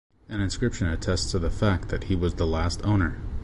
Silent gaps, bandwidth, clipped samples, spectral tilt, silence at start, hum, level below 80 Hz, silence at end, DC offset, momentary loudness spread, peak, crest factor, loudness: none; 11 kHz; under 0.1%; -6 dB/octave; 0.3 s; none; -32 dBFS; 0 s; under 0.1%; 5 LU; -10 dBFS; 14 dB; -27 LUFS